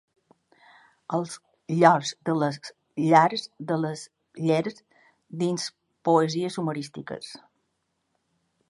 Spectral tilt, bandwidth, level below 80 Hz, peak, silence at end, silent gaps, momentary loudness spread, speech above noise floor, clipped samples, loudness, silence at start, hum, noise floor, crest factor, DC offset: -5.5 dB/octave; 11.5 kHz; -76 dBFS; -2 dBFS; 1.35 s; none; 20 LU; 52 dB; under 0.1%; -25 LUFS; 1.1 s; none; -76 dBFS; 24 dB; under 0.1%